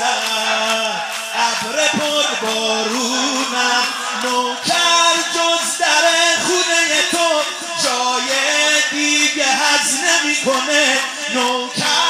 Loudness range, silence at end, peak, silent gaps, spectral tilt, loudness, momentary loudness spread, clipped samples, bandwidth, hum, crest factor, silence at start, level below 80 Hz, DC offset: 3 LU; 0 s; -2 dBFS; none; 0 dB/octave; -15 LUFS; 5 LU; under 0.1%; 16 kHz; none; 16 dB; 0 s; -74 dBFS; under 0.1%